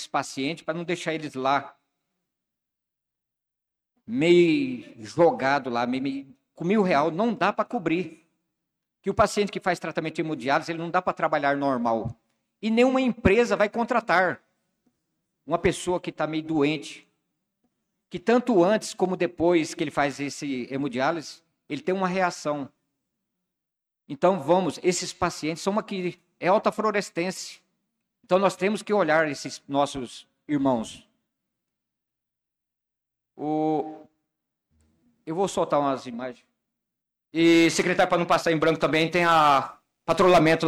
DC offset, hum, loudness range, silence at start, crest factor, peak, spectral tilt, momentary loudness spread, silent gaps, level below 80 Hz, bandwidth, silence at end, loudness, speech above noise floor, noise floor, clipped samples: under 0.1%; none; 8 LU; 0 s; 18 dB; -8 dBFS; -5 dB/octave; 14 LU; none; -56 dBFS; 14 kHz; 0 s; -24 LUFS; 63 dB; -87 dBFS; under 0.1%